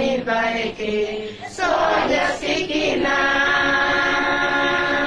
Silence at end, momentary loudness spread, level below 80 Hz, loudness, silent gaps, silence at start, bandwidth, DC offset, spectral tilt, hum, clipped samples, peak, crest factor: 0 s; 7 LU; -44 dBFS; -19 LUFS; none; 0 s; 10.5 kHz; under 0.1%; -3.5 dB/octave; none; under 0.1%; -8 dBFS; 12 dB